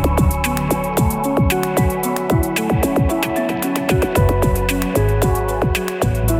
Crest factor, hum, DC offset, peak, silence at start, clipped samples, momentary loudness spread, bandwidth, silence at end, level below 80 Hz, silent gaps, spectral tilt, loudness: 14 dB; none; under 0.1%; -2 dBFS; 0 s; under 0.1%; 3 LU; 19 kHz; 0 s; -24 dBFS; none; -6 dB/octave; -18 LUFS